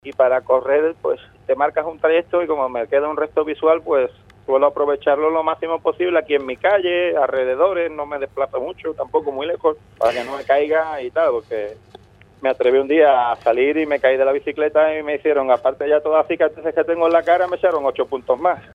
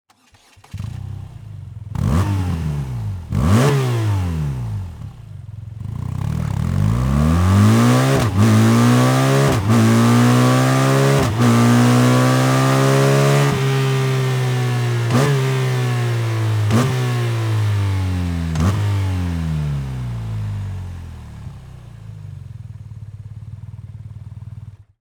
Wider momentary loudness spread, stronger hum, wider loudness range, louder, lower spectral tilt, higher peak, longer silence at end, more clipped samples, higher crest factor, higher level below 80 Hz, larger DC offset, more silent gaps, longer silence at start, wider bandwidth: second, 8 LU vs 22 LU; neither; second, 4 LU vs 16 LU; about the same, -19 LUFS vs -17 LUFS; about the same, -6 dB/octave vs -6.5 dB/octave; about the same, -2 dBFS vs -2 dBFS; second, 0.15 s vs 0.3 s; neither; about the same, 16 dB vs 14 dB; second, -56 dBFS vs -36 dBFS; neither; neither; second, 0.05 s vs 0.75 s; second, 7.2 kHz vs over 20 kHz